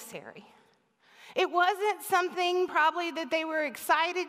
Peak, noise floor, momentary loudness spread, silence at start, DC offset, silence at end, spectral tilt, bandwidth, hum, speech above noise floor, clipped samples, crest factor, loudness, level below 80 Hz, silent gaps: -12 dBFS; -64 dBFS; 10 LU; 0 s; under 0.1%; 0 s; -2 dB/octave; 16 kHz; none; 35 dB; under 0.1%; 18 dB; -28 LUFS; -86 dBFS; none